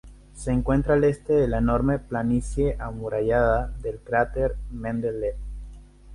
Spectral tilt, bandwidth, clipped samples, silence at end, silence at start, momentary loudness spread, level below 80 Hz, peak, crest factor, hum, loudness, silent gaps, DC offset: -8 dB/octave; 11.5 kHz; under 0.1%; 0 s; 0.05 s; 12 LU; -34 dBFS; -8 dBFS; 18 dB; 50 Hz at -35 dBFS; -25 LUFS; none; under 0.1%